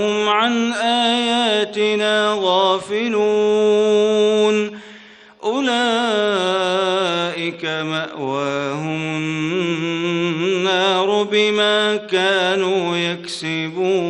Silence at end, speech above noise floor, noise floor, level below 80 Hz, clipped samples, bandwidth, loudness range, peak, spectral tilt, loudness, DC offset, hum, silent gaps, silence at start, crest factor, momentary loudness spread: 0 s; 25 dB; -43 dBFS; -64 dBFS; under 0.1%; 10 kHz; 4 LU; -4 dBFS; -4 dB/octave; -18 LUFS; under 0.1%; none; none; 0 s; 16 dB; 7 LU